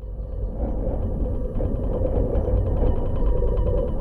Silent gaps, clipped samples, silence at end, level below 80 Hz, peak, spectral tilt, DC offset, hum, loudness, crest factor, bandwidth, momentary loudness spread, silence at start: none; under 0.1%; 0 s; -24 dBFS; -10 dBFS; -11 dB/octave; under 0.1%; none; -26 LUFS; 12 dB; 3.3 kHz; 6 LU; 0 s